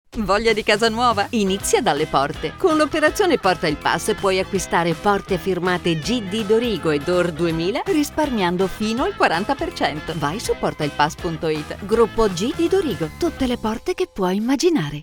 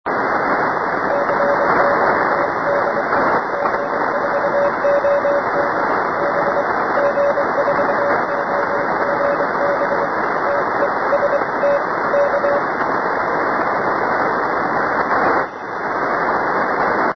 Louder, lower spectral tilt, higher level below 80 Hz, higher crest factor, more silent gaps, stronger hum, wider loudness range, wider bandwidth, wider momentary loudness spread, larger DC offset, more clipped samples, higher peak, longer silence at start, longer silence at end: second, -20 LUFS vs -17 LUFS; second, -4.5 dB/octave vs -6.5 dB/octave; first, -40 dBFS vs -54 dBFS; about the same, 18 dB vs 14 dB; neither; neither; about the same, 3 LU vs 1 LU; first, over 20 kHz vs 6.2 kHz; first, 6 LU vs 3 LU; second, under 0.1% vs 0.2%; neither; about the same, -2 dBFS vs -2 dBFS; about the same, 0.15 s vs 0.05 s; about the same, 0 s vs 0 s